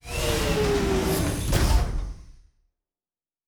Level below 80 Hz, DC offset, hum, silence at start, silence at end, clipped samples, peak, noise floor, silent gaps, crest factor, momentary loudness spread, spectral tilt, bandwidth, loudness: -30 dBFS; under 0.1%; none; 0.05 s; 1.15 s; under 0.1%; -10 dBFS; under -90 dBFS; none; 16 dB; 8 LU; -5 dB/octave; over 20 kHz; -25 LUFS